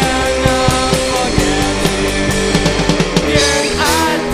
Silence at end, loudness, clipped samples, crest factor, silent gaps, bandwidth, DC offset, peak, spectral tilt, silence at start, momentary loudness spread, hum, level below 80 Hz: 0 s; -13 LUFS; under 0.1%; 14 dB; none; 15.5 kHz; under 0.1%; 0 dBFS; -4 dB/octave; 0 s; 3 LU; none; -24 dBFS